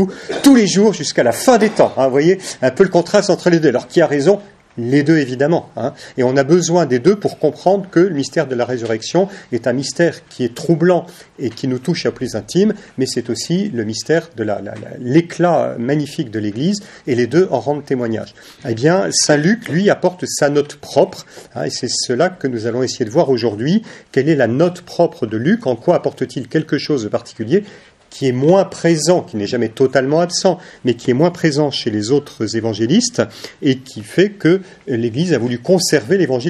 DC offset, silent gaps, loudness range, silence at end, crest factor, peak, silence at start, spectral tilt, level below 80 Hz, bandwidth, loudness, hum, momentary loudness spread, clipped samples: under 0.1%; none; 4 LU; 0 s; 16 dB; 0 dBFS; 0 s; -5 dB/octave; -58 dBFS; 13.5 kHz; -16 LUFS; none; 9 LU; under 0.1%